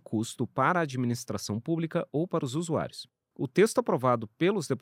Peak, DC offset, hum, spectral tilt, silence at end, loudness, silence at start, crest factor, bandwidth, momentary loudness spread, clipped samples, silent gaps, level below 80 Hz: -10 dBFS; under 0.1%; none; -6 dB/octave; 0.05 s; -29 LUFS; 0.1 s; 18 dB; 16 kHz; 9 LU; under 0.1%; none; -70 dBFS